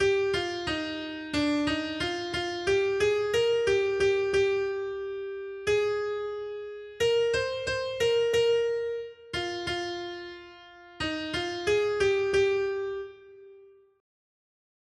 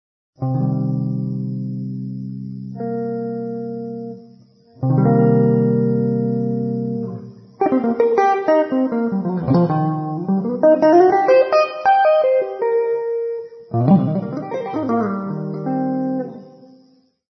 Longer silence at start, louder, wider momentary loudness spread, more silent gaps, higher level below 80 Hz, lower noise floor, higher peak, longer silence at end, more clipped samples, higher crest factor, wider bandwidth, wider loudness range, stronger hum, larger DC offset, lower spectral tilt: second, 0 s vs 0.4 s; second, -28 LUFS vs -18 LUFS; about the same, 12 LU vs 14 LU; neither; about the same, -56 dBFS vs -60 dBFS; about the same, -54 dBFS vs -54 dBFS; second, -14 dBFS vs -2 dBFS; first, 1.35 s vs 0.7 s; neither; about the same, 14 dB vs 16 dB; first, 12.5 kHz vs 6.2 kHz; second, 4 LU vs 9 LU; neither; neither; second, -4 dB/octave vs -9.5 dB/octave